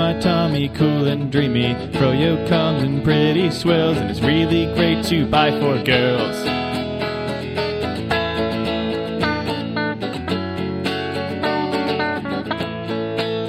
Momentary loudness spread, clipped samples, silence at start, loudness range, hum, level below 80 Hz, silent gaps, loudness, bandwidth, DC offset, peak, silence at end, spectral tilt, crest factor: 7 LU; under 0.1%; 0 s; 5 LU; none; -42 dBFS; none; -20 LUFS; 15 kHz; under 0.1%; -2 dBFS; 0 s; -6.5 dB/octave; 18 dB